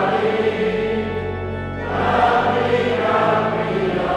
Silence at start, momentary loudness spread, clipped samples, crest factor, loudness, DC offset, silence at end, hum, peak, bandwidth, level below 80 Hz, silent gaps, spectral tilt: 0 s; 9 LU; under 0.1%; 14 dB; -19 LUFS; under 0.1%; 0 s; none; -4 dBFS; 10.5 kHz; -42 dBFS; none; -7 dB/octave